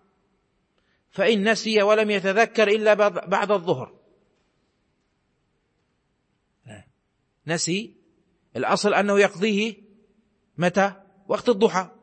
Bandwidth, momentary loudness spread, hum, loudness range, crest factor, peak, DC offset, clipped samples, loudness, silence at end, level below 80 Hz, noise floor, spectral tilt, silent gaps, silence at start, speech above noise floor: 8.8 kHz; 10 LU; none; 12 LU; 18 dB; -6 dBFS; under 0.1%; under 0.1%; -22 LUFS; 0.15 s; -72 dBFS; -72 dBFS; -4.5 dB/octave; none; 1.15 s; 50 dB